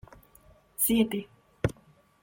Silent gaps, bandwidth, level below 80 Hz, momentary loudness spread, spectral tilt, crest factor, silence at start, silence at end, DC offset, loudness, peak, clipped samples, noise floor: none; 17 kHz; -54 dBFS; 12 LU; -4.5 dB/octave; 20 dB; 0.8 s; 0.5 s; under 0.1%; -28 LUFS; -10 dBFS; under 0.1%; -61 dBFS